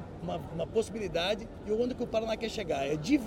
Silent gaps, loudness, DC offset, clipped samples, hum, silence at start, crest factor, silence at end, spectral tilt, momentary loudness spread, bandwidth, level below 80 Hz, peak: none; -33 LUFS; under 0.1%; under 0.1%; none; 0 s; 18 dB; 0 s; -5.5 dB/octave; 5 LU; 16.5 kHz; -52 dBFS; -14 dBFS